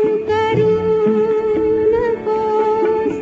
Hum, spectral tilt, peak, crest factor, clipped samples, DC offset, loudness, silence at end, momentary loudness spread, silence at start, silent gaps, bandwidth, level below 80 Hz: none; -6 dB/octave; -4 dBFS; 10 dB; under 0.1%; under 0.1%; -16 LUFS; 0 s; 2 LU; 0 s; none; 7.2 kHz; -44 dBFS